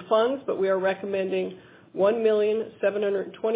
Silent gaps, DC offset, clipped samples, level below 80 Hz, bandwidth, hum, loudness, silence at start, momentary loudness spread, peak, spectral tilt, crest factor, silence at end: none; under 0.1%; under 0.1%; -72 dBFS; 4 kHz; none; -25 LUFS; 0 s; 6 LU; -8 dBFS; -9.5 dB/octave; 16 dB; 0 s